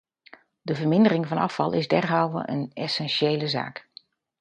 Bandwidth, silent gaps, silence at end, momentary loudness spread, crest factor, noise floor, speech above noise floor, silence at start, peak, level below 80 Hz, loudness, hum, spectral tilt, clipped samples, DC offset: 9.6 kHz; none; 0.6 s; 11 LU; 18 dB; -53 dBFS; 30 dB; 0.65 s; -6 dBFS; -68 dBFS; -24 LUFS; none; -6.5 dB/octave; under 0.1%; under 0.1%